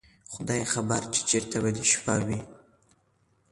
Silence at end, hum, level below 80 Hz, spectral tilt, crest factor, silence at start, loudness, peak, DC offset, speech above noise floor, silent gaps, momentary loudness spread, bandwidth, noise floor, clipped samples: 0.95 s; none; -56 dBFS; -3.5 dB/octave; 20 dB; 0.3 s; -27 LUFS; -10 dBFS; under 0.1%; 40 dB; none; 11 LU; 11.5 kHz; -68 dBFS; under 0.1%